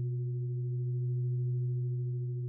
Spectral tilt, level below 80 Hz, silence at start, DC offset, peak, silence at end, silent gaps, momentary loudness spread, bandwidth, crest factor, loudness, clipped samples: -12.5 dB/octave; -76 dBFS; 0 s; under 0.1%; -28 dBFS; 0 s; none; 2 LU; 0.4 kHz; 6 dB; -34 LUFS; under 0.1%